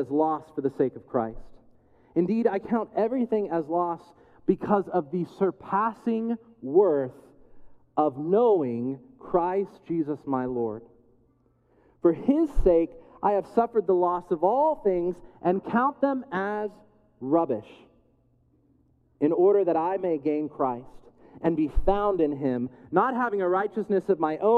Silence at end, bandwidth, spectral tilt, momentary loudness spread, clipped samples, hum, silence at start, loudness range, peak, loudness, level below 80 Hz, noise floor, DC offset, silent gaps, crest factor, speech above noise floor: 0 s; 4.9 kHz; -9.5 dB/octave; 9 LU; under 0.1%; none; 0 s; 4 LU; -6 dBFS; -26 LUFS; -42 dBFS; -65 dBFS; under 0.1%; none; 20 dB; 40 dB